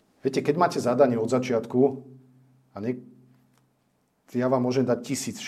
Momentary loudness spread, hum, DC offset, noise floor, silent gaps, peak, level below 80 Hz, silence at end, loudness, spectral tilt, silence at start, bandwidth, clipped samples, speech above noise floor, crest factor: 12 LU; none; under 0.1%; -70 dBFS; none; -6 dBFS; -72 dBFS; 0 s; -25 LUFS; -6 dB/octave; 0.25 s; 15 kHz; under 0.1%; 45 dB; 20 dB